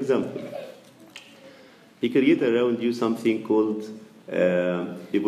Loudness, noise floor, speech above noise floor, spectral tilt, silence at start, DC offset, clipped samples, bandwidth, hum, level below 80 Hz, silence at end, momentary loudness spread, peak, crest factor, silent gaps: -24 LUFS; -51 dBFS; 28 dB; -7 dB/octave; 0 s; under 0.1%; under 0.1%; 14 kHz; none; -76 dBFS; 0 s; 23 LU; -8 dBFS; 16 dB; none